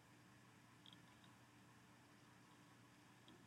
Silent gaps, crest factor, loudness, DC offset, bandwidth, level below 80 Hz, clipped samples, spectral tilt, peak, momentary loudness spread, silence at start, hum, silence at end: none; 20 dB; -67 LUFS; under 0.1%; 15 kHz; under -90 dBFS; under 0.1%; -4 dB/octave; -48 dBFS; 3 LU; 0 s; none; 0 s